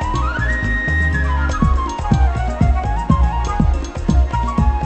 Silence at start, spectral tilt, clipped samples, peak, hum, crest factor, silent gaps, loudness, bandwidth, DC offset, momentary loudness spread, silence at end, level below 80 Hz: 0 s; -7 dB/octave; under 0.1%; 0 dBFS; none; 16 dB; none; -18 LUFS; 8.4 kHz; under 0.1%; 2 LU; 0 s; -18 dBFS